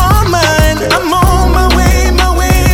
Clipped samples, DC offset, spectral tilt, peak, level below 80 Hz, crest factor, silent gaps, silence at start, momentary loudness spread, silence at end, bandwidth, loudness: under 0.1%; under 0.1%; -4.5 dB/octave; 0 dBFS; -12 dBFS; 8 dB; none; 0 s; 2 LU; 0 s; 17 kHz; -10 LUFS